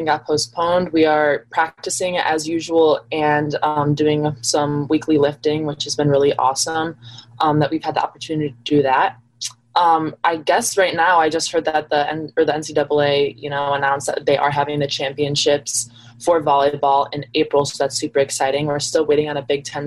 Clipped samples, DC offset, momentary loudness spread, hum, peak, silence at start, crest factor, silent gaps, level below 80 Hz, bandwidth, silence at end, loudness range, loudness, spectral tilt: under 0.1%; under 0.1%; 6 LU; none; -4 dBFS; 0 s; 14 dB; none; -56 dBFS; 12.5 kHz; 0 s; 2 LU; -18 LUFS; -4 dB/octave